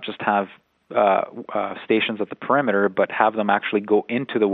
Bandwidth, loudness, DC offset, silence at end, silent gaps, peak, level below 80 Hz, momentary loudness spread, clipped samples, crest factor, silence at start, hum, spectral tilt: 4.3 kHz; -21 LUFS; under 0.1%; 0 s; none; -2 dBFS; -72 dBFS; 8 LU; under 0.1%; 20 dB; 0 s; none; -8.5 dB/octave